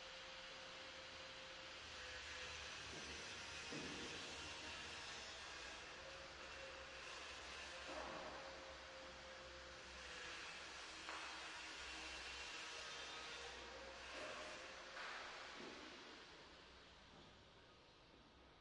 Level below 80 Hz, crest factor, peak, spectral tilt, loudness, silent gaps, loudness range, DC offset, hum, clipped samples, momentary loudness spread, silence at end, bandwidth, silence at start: -72 dBFS; 20 dB; -34 dBFS; -1.5 dB/octave; -52 LUFS; none; 3 LU; under 0.1%; none; under 0.1%; 11 LU; 0 s; 11 kHz; 0 s